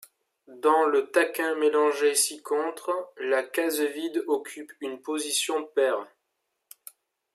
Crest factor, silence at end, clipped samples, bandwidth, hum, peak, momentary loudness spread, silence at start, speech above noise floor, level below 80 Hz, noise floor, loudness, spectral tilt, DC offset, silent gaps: 18 dB; 1.3 s; under 0.1%; 15.5 kHz; none; -8 dBFS; 14 LU; 0.5 s; 53 dB; -88 dBFS; -79 dBFS; -26 LUFS; -0.5 dB/octave; under 0.1%; none